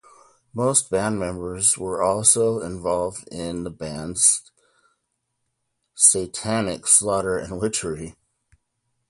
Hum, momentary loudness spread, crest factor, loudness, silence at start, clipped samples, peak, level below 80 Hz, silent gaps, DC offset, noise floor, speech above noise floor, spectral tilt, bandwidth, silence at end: none; 15 LU; 22 dB; -20 LUFS; 0.55 s; under 0.1%; -2 dBFS; -50 dBFS; none; under 0.1%; -76 dBFS; 54 dB; -3 dB/octave; 12 kHz; 1 s